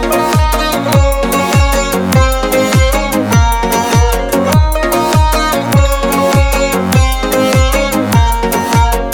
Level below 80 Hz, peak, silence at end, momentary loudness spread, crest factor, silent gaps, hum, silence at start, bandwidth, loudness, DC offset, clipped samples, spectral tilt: -16 dBFS; 0 dBFS; 0 s; 2 LU; 10 dB; none; none; 0 s; 19.5 kHz; -11 LUFS; under 0.1%; under 0.1%; -5 dB/octave